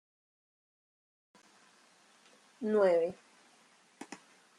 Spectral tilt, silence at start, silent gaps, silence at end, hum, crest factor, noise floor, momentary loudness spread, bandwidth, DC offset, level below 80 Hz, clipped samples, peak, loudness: -6 dB/octave; 2.6 s; none; 0.45 s; none; 20 dB; -65 dBFS; 26 LU; 11.5 kHz; under 0.1%; -86 dBFS; under 0.1%; -16 dBFS; -31 LUFS